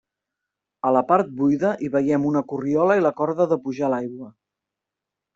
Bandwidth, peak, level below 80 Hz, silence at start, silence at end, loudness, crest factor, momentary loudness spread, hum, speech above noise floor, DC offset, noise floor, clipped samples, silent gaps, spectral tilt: 7.6 kHz; -4 dBFS; -64 dBFS; 0.85 s; 1.05 s; -21 LUFS; 18 dB; 7 LU; none; 65 dB; under 0.1%; -86 dBFS; under 0.1%; none; -8.5 dB/octave